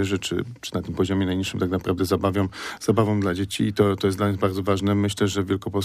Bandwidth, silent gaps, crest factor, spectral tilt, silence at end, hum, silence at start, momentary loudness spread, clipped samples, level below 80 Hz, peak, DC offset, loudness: 15.5 kHz; none; 16 dB; -6 dB/octave; 0 s; none; 0 s; 7 LU; under 0.1%; -50 dBFS; -6 dBFS; under 0.1%; -24 LUFS